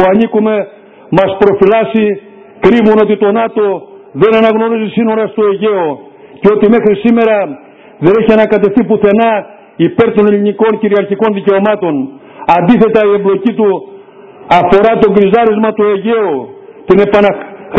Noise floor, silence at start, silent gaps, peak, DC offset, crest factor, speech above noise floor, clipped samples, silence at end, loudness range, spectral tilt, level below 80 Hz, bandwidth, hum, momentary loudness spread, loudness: -34 dBFS; 0 s; none; 0 dBFS; under 0.1%; 10 dB; 25 dB; 0.9%; 0 s; 2 LU; -8.5 dB/octave; -44 dBFS; 5.2 kHz; none; 9 LU; -10 LUFS